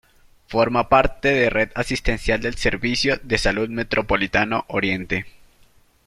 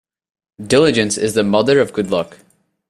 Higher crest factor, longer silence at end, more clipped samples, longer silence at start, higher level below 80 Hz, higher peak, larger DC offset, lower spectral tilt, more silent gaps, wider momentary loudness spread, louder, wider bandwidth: about the same, 20 dB vs 16 dB; first, 0.8 s vs 0.65 s; neither; about the same, 0.5 s vs 0.6 s; first, -34 dBFS vs -50 dBFS; about the same, -2 dBFS vs 0 dBFS; neither; about the same, -4.5 dB/octave vs -4.5 dB/octave; neither; about the same, 7 LU vs 9 LU; second, -21 LUFS vs -15 LUFS; about the same, 14 kHz vs 13.5 kHz